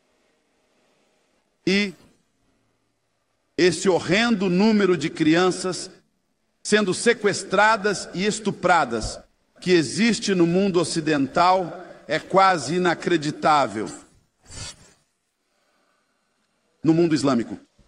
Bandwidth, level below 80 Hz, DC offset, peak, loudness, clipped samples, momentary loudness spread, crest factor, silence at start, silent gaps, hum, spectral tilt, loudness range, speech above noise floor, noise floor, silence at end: 11 kHz; -54 dBFS; under 0.1%; -4 dBFS; -21 LUFS; under 0.1%; 15 LU; 18 dB; 1.65 s; none; none; -4.5 dB/octave; 7 LU; 52 dB; -72 dBFS; 0.3 s